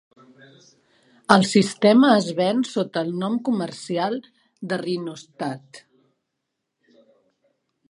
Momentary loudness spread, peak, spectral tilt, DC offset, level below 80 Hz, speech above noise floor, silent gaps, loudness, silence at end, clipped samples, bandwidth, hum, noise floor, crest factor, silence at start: 16 LU; 0 dBFS; -5.5 dB/octave; under 0.1%; -68 dBFS; 59 dB; none; -21 LUFS; 2.15 s; under 0.1%; 11.5 kHz; none; -80 dBFS; 24 dB; 1.3 s